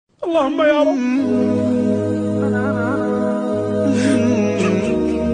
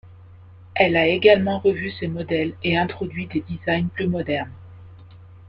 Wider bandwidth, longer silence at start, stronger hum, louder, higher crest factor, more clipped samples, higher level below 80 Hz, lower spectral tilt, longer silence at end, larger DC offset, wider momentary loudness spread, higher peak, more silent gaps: first, 10 kHz vs 5.6 kHz; first, 0.2 s vs 0.05 s; neither; first, -17 LUFS vs -21 LUFS; second, 14 dB vs 20 dB; neither; first, -46 dBFS vs -52 dBFS; second, -7 dB/octave vs -9 dB/octave; about the same, 0 s vs 0.1 s; neither; second, 4 LU vs 12 LU; about the same, -4 dBFS vs -2 dBFS; neither